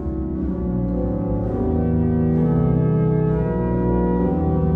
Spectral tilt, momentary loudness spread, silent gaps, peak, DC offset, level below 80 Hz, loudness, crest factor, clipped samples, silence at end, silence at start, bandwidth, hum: -13 dB/octave; 5 LU; none; -8 dBFS; under 0.1%; -28 dBFS; -20 LUFS; 12 dB; under 0.1%; 0 s; 0 s; 3 kHz; 60 Hz at -30 dBFS